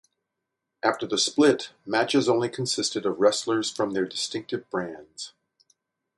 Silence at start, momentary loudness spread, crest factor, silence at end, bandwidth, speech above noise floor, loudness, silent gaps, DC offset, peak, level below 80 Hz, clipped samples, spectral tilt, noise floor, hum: 0.85 s; 12 LU; 20 dB; 0.9 s; 11.5 kHz; 58 dB; -25 LUFS; none; under 0.1%; -6 dBFS; -70 dBFS; under 0.1%; -3.5 dB/octave; -83 dBFS; none